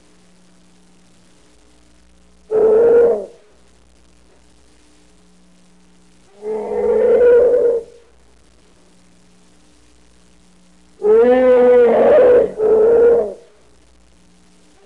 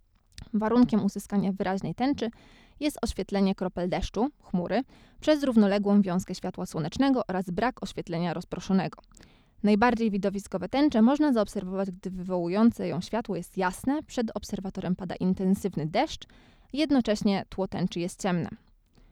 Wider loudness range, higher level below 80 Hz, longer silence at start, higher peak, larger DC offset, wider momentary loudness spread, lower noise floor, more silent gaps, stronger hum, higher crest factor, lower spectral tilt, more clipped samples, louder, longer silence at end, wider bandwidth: first, 11 LU vs 4 LU; about the same, -50 dBFS vs -50 dBFS; first, 2.5 s vs 0.4 s; first, -4 dBFS vs -10 dBFS; first, 0.3% vs under 0.1%; about the same, 13 LU vs 11 LU; about the same, -51 dBFS vs -49 dBFS; neither; neither; about the same, 14 dB vs 18 dB; about the same, -6.5 dB/octave vs -6.5 dB/octave; neither; first, -13 LUFS vs -28 LUFS; first, 1.5 s vs 0.55 s; second, 4.6 kHz vs 14 kHz